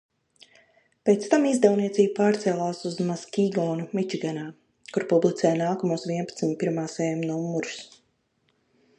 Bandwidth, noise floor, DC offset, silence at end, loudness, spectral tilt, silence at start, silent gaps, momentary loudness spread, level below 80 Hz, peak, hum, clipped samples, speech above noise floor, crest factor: 10.5 kHz; -70 dBFS; under 0.1%; 1.15 s; -25 LUFS; -6 dB/octave; 1.05 s; none; 10 LU; -74 dBFS; -4 dBFS; none; under 0.1%; 46 dB; 22 dB